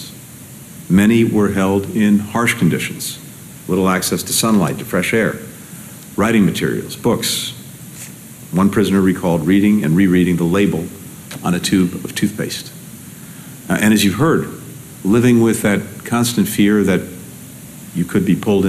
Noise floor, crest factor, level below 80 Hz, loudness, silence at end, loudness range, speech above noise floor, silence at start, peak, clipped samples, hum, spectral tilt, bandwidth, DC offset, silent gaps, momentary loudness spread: -36 dBFS; 14 dB; -48 dBFS; -16 LUFS; 0 s; 3 LU; 21 dB; 0 s; -4 dBFS; under 0.1%; none; -5 dB/octave; 15 kHz; under 0.1%; none; 20 LU